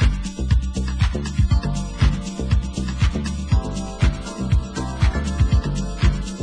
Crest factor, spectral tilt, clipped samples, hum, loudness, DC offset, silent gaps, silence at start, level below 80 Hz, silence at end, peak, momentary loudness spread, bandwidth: 14 dB; -6 dB/octave; under 0.1%; none; -22 LUFS; under 0.1%; none; 0 s; -22 dBFS; 0 s; -4 dBFS; 6 LU; 10 kHz